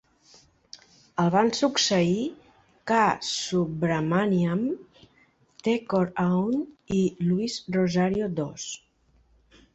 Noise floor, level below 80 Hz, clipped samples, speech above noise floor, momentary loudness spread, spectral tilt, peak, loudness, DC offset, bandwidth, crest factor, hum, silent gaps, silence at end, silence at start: -63 dBFS; -60 dBFS; under 0.1%; 39 dB; 11 LU; -5 dB/octave; -8 dBFS; -25 LUFS; under 0.1%; 8.2 kHz; 18 dB; none; none; 0.95 s; 1.15 s